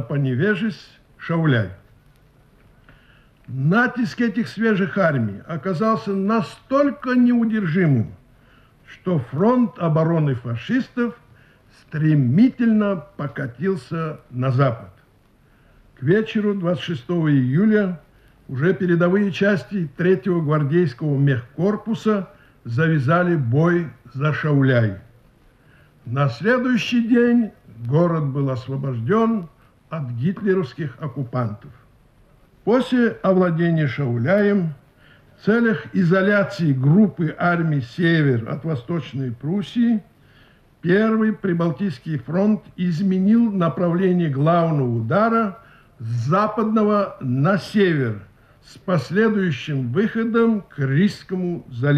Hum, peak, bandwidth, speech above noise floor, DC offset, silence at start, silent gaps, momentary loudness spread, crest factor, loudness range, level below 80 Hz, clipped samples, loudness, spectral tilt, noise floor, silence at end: none; -6 dBFS; 8.8 kHz; 36 dB; under 0.1%; 0 s; none; 10 LU; 16 dB; 4 LU; -58 dBFS; under 0.1%; -20 LUFS; -8.5 dB/octave; -55 dBFS; 0 s